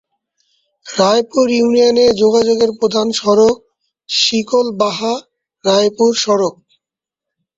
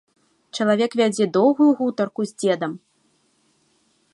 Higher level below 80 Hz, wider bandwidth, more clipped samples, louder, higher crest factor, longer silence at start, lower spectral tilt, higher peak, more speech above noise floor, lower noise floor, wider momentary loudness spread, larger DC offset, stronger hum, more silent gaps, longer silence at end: first, -54 dBFS vs -74 dBFS; second, 8 kHz vs 11.5 kHz; neither; first, -14 LUFS vs -20 LUFS; about the same, 14 dB vs 16 dB; first, 0.85 s vs 0.55 s; second, -3.5 dB/octave vs -5.5 dB/octave; first, -2 dBFS vs -6 dBFS; first, 72 dB vs 45 dB; first, -85 dBFS vs -64 dBFS; about the same, 9 LU vs 11 LU; neither; neither; neither; second, 1.05 s vs 1.35 s